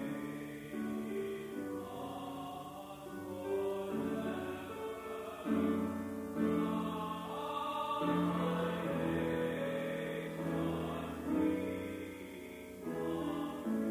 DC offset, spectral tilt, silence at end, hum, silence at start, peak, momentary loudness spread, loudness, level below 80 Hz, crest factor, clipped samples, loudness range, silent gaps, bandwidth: under 0.1%; -6.5 dB/octave; 0 s; none; 0 s; -22 dBFS; 11 LU; -38 LUFS; -62 dBFS; 16 dB; under 0.1%; 5 LU; none; 16 kHz